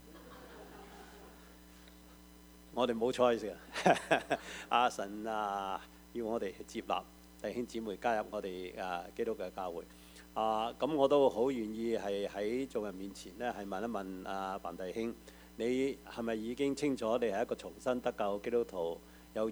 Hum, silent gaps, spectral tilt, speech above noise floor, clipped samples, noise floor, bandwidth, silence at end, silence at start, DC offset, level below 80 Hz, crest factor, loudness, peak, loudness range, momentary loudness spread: none; none; -5 dB/octave; 22 dB; under 0.1%; -57 dBFS; over 20 kHz; 0 s; 0 s; under 0.1%; -62 dBFS; 24 dB; -36 LUFS; -12 dBFS; 6 LU; 21 LU